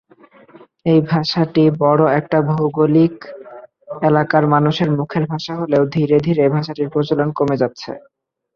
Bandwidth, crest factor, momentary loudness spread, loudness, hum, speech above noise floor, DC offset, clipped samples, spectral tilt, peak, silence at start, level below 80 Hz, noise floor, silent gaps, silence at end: 6.8 kHz; 14 dB; 10 LU; -16 LUFS; none; 32 dB; under 0.1%; under 0.1%; -8 dB/octave; -2 dBFS; 0.85 s; -54 dBFS; -47 dBFS; none; 0.55 s